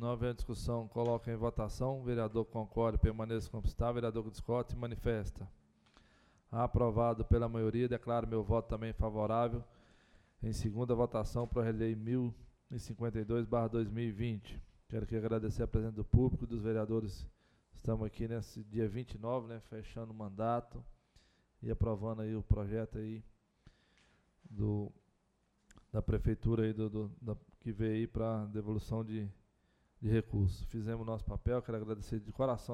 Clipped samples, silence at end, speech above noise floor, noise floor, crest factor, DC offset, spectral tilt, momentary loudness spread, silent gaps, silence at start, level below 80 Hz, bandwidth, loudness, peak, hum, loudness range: under 0.1%; 0 s; 40 dB; -76 dBFS; 24 dB; under 0.1%; -8.5 dB/octave; 12 LU; none; 0 s; -46 dBFS; 12 kHz; -37 LUFS; -14 dBFS; none; 5 LU